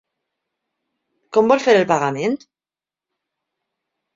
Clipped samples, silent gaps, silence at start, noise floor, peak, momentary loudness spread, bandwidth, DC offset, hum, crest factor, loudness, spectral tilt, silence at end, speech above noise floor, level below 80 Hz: under 0.1%; none; 1.35 s; under -90 dBFS; -2 dBFS; 9 LU; 7.6 kHz; under 0.1%; none; 20 dB; -17 LUFS; -5 dB/octave; 1.8 s; over 74 dB; -66 dBFS